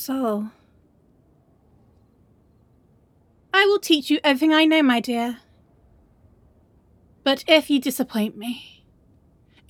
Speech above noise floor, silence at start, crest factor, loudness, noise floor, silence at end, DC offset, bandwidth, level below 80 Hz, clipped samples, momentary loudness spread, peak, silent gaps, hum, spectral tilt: 39 dB; 0 s; 22 dB; -20 LUFS; -59 dBFS; 1.05 s; under 0.1%; 18.5 kHz; -64 dBFS; under 0.1%; 15 LU; -2 dBFS; none; none; -3.5 dB/octave